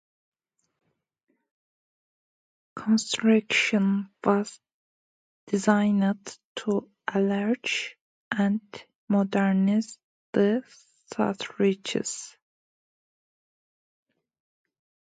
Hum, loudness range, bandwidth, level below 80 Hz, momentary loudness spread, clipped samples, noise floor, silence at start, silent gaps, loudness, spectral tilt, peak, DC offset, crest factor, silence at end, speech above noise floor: none; 6 LU; 9.4 kHz; -72 dBFS; 15 LU; under 0.1%; under -90 dBFS; 2.75 s; 4.74-5.47 s, 6.44-6.55 s, 8.01-8.31 s, 8.95-9.08 s, 10.04-10.33 s; -26 LUFS; -5 dB/octave; -6 dBFS; under 0.1%; 22 dB; 2.85 s; over 65 dB